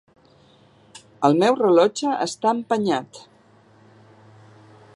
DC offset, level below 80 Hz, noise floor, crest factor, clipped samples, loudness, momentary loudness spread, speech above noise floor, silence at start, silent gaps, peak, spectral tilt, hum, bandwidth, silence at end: under 0.1%; -72 dBFS; -54 dBFS; 20 dB; under 0.1%; -20 LUFS; 8 LU; 35 dB; 1.2 s; none; -2 dBFS; -5 dB/octave; none; 11.5 kHz; 1.75 s